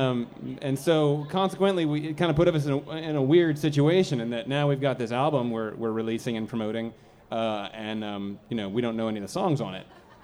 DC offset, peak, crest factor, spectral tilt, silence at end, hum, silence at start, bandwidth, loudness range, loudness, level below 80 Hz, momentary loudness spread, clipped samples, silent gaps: under 0.1%; -10 dBFS; 18 dB; -7 dB/octave; 0.25 s; none; 0 s; 14.5 kHz; 7 LU; -27 LUFS; -56 dBFS; 11 LU; under 0.1%; none